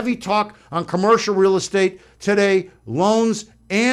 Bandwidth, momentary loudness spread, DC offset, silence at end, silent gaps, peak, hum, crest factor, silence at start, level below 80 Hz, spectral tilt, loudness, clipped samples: 11.5 kHz; 10 LU; under 0.1%; 0 s; none; -4 dBFS; none; 14 dB; 0 s; -56 dBFS; -5 dB/octave; -19 LUFS; under 0.1%